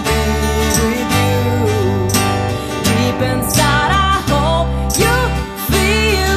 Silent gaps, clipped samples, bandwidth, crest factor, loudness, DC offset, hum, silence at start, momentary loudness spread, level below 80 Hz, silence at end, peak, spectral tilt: none; under 0.1%; 14 kHz; 14 dB; -15 LUFS; under 0.1%; none; 0 s; 4 LU; -24 dBFS; 0 s; 0 dBFS; -4.5 dB/octave